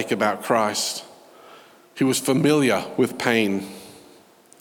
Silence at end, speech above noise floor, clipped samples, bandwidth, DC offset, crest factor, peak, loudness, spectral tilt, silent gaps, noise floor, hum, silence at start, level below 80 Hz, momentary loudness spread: 0.65 s; 30 dB; under 0.1%; over 20 kHz; under 0.1%; 20 dB; -4 dBFS; -21 LUFS; -4 dB/octave; none; -52 dBFS; none; 0 s; -72 dBFS; 14 LU